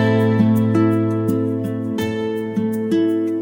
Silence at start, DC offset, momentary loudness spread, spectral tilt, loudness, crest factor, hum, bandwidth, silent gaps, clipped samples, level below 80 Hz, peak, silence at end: 0 s; under 0.1%; 7 LU; -8 dB/octave; -19 LUFS; 14 dB; none; 17 kHz; none; under 0.1%; -56 dBFS; -4 dBFS; 0 s